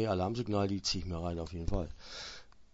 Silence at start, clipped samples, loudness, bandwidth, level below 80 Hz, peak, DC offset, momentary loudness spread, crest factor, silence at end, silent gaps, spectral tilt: 0 s; under 0.1%; -36 LUFS; 7.6 kHz; -46 dBFS; -18 dBFS; under 0.1%; 12 LU; 16 dB; 0.1 s; none; -5.5 dB/octave